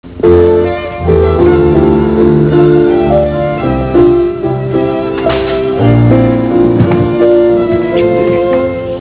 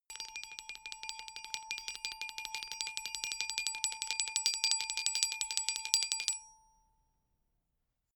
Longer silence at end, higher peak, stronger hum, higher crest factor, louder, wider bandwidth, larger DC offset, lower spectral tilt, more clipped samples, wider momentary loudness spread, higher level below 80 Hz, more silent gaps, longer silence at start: second, 0 s vs 1.6 s; about the same, 0 dBFS vs -2 dBFS; neither; second, 8 dB vs 36 dB; first, -9 LUFS vs -35 LUFS; second, 4 kHz vs over 20 kHz; first, 0.4% vs under 0.1%; first, -12.5 dB/octave vs 4.5 dB/octave; first, 0.9% vs under 0.1%; second, 6 LU vs 12 LU; first, -24 dBFS vs -72 dBFS; neither; about the same, 0.05 s vs 0.1 s